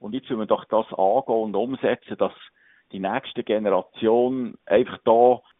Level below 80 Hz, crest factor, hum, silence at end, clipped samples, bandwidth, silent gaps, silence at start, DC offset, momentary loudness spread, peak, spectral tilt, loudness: -66 dBFS; 20 dB; none; 0.2 s; under 0.1%; 3.9 kHz; none; 0 s; under 0.1%; 10 LU; -4 dBFS; -4.5 dB/octave; -23 LUFS